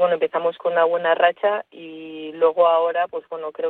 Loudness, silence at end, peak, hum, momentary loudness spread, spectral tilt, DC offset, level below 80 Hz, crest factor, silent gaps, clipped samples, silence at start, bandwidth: -20 LUFS; 0 s; -4 dBFS; none; 17 LU; -7 dB/octave; under 0.1%; -74 dBFS; 16 dB; none; under 0.1%; 0 s; 4.1 kHz